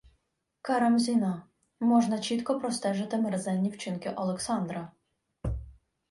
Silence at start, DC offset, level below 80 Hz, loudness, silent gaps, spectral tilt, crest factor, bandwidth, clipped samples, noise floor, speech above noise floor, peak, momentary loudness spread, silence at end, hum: 0.65 s; under 0.1%; -50 dBFS; -29 LUFS; none; -5.5 dB/octave; 16 dB; 11.5 kHz; under 0.1%; -77 dBFS; 49 dB; -14 dBFS; 14 LU; 0.4 s; none